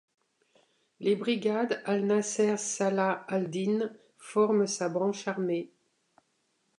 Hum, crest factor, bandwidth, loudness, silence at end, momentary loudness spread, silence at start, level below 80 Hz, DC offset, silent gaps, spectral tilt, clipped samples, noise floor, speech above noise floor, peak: none; 18 dB; 11 kHz; -29 LUFS; 1.15 s; 7 LU; 1 s; -82 dBFS; under 0.1%; none; -4.5 dB/octave; under 0.1%; -75 dBFS; 46 dB; -14 dBFS